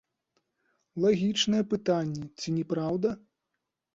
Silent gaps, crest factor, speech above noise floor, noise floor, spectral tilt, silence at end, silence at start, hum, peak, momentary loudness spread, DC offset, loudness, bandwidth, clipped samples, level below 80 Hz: none; 18 dB; 56 dB; -84 dBFS; -5.5 dB/octave; 0.75 s; 0.95 s; none; -12 dBFS; 10 LU; under 0.1%; -28 LUFS; 8 kHz; under 0.1%; -66 dBFS